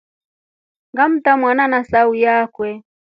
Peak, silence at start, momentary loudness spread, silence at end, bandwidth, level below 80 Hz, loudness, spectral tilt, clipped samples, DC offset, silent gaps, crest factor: 0 dBFS; 0.95 s; 12 LU; 0.35 s; 5.4 kHz; -56 dBFS; -15 LUFS; -7.5 dB/octave; under 0.1%; under 0.1%; none; 16 dB